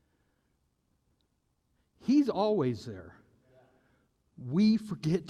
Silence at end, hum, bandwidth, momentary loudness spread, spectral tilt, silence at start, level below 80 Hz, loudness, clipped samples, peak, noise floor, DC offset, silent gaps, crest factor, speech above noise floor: 0 s; none; 11 kHz; 19 LU; -7.5 dB/octave; 2.05 s; -70 dBFS; -29 LUFS; under 0.1%; -16 dBFS; -76 dBFS; under 0.1%; none; 16 dB; 48 dB